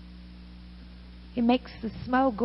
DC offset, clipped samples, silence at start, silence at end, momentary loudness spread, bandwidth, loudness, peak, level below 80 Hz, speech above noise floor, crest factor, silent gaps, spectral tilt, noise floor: under 0.1%; under 0.1%; 0 s; 0 s; 22 LU; 5.8 kHz; -28 LUFS; -12 dBFS; -48 dBFS; 20 dB; 18 dB; none; -9 dB/octave; -46 dBFS